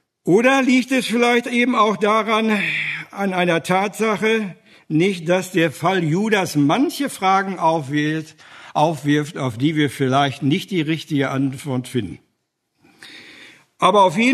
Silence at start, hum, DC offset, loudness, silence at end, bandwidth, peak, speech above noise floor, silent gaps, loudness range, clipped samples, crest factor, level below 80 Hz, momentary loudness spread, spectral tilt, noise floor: 0.25 s; none; under 0.1%; -19 LUFS; 0 s; 13.5 kHz; 0 dBFS; 54 dB; none; 4 LU; under 0.1%; 18 dB; -64 dBFS; 9 LU; -5.5 dB/octave; -72 dBFS